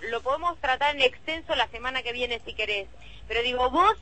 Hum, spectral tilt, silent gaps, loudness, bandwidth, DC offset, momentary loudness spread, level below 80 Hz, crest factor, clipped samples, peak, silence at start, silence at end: none; -3 dB/octave; none; -26 LUFS; 8.6 kHz; 0.5%; 8 LU; -48 dBFS; 20 dB; under 0.1%; -8 dBFS; 0 s; 0 s